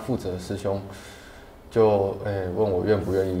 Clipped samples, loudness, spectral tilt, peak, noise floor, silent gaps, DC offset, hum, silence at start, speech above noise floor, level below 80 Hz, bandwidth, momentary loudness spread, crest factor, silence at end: under 0.1%; -25 LUFS; -7.5 dB/octave; -8 dBFS; -45 dBFS; none; under 0.1%; none; 0 s; 21 dB; -48 dBFS; 16 kHz; 20 LU; 16 dB; 0 s